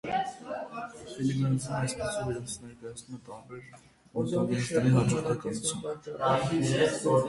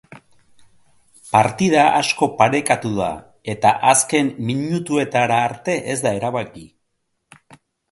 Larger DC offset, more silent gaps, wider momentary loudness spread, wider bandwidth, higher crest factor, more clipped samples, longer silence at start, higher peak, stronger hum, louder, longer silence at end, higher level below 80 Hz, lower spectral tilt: neither; neither; first, 18 LU vs 10 LU; about the same, 11.5 kHz vs 12 kHz; about the same, 18 dB vs 20 dB; neither; about the same, 0.05 s vs 0.1 s; second, -12 dBFS vs 0 dBFS; neither; second, -30 LUFS vs -18 LUFS; second, 0 s vs 1.25 s; about the same, -58 dBFS vs -54 dBFS; first, -5.5 dB/octave vs -4 dB/octave